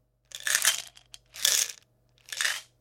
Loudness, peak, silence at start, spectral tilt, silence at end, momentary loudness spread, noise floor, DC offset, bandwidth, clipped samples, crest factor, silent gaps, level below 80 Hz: -26 LUFS; -2 dBFS; 0.35 s; 3.5 dB/octave; 0.2 s; 21 LU; -64 dBFS; under 0.1%; 17 kHz; under 0.1%; 30 dB; none; -72 dBFS